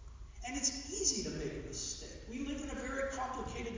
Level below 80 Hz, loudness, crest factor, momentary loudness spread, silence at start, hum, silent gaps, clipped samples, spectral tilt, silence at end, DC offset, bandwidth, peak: -50 dBFS; -38 LUFS; 20 dB; 11 LU; 0 s; none; none; under 0.1%; -2.5 dB/octave; 0 s; under 0.1%; 7.8 kHz; -18 dBFS